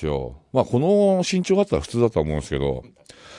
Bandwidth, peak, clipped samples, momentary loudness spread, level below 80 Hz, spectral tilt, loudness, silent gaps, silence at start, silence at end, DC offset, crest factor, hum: 11.5 kHz; -4 dBFS; under 0.1%; 9 LU; -40 dBFS; -6.5 dB/octave; -21 LUFS; none; 0 s; 0 s; under 0.1%; 16 dB; none